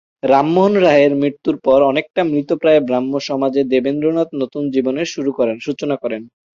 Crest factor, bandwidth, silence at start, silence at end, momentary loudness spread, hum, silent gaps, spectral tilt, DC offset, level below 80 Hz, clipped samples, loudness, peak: 14 dB; 7.4 kHz; 0.25 s; 0.3 s; 9 LU; none; none; -6.5 dB/octave; under 0.1%; -56 dBFS; under 0.1%; -16 LUFS; -2 dBFS